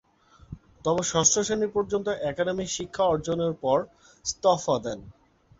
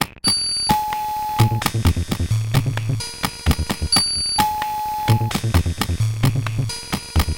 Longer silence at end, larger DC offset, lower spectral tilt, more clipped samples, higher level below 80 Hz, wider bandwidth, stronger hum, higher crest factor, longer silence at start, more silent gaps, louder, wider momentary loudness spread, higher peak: first, 0.5 s vs 0 s; neither; about the same, -3.5 dB/octave vs -4 dB/octave; neither; second, -54 dBFS vs -30 dBFS; second, 8 kHz vs 17.5 kHz; neither; about the same, 20 dB vs 18 dB; first, 0.5 s vs 0 s; neither; second, -26 LUFS vs -20 LUFS; first, 16 LU vs 6 LU; second, -8 dBFS vs -2 dBFS